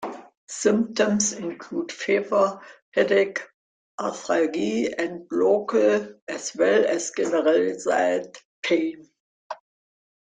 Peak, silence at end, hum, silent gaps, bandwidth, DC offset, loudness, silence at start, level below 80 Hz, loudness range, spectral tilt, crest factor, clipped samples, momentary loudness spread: -6 dBFS; 0.65 s; none; 0.37-0.47 s, 2.82-2.92 s, 3.54-3.98 s, 6.22-6.27 s, 8.45-8.63 s, 9.20-9.50 s; 9.6 kHz; under 0.1%; -23 LUFS; 0 s; -70 dBFS; 3 LU; -3.5 dB/octave; 18 dB; under 0.1%; 16 LU